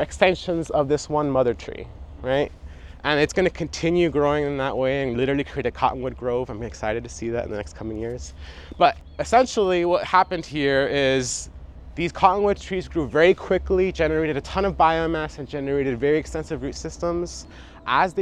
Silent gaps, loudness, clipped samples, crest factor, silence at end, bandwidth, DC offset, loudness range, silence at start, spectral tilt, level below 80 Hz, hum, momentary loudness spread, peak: none; -23 LUFS; under 0.1%; 22 dB; 0 s; 11.5 kHz; under 0.1%; 5 LU; 0 s; -5 dB/octave; -40 dBFS; none; 13 LU; -2 dBFS